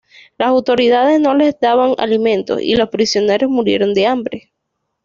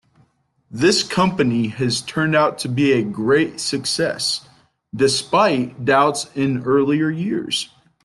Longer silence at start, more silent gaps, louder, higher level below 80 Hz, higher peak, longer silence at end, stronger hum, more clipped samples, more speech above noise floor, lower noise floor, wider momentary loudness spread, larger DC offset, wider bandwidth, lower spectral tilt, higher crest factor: second, 0.4 s vs 0.7 s; neither; first, -14 LUFS vs -19 LUFS; first, -52 dBFS vs -58 dBFS; about the same, -2 dBFS vs -4 dBFS; first, 0.65 s vs 0.4 s; neither; neither; first, 59 dB vs 42 dB; first, -73 dBFS vs -61 dBFS; about the same, 5 LU vs 6 LU; neither; second, 7.6 kHz vs 12.5 kHz; about the same, -4.5 dB/octave vs -4.5 dB/octave; about the same, 12 dB vs 16 dB